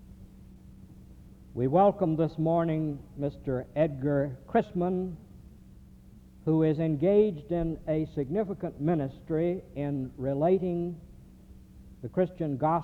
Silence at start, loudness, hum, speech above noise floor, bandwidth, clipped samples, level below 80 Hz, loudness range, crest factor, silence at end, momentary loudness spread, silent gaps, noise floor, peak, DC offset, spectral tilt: 0 s; -29 LUFS; none; 24 dB; 4.7 kHz; under 0.1%; -52 dBFS; 3 LU; 18 dB; 0 s; 11 LU; none; -52 dBFS; -12 dBFS; under 0.1%; -10 dB/octave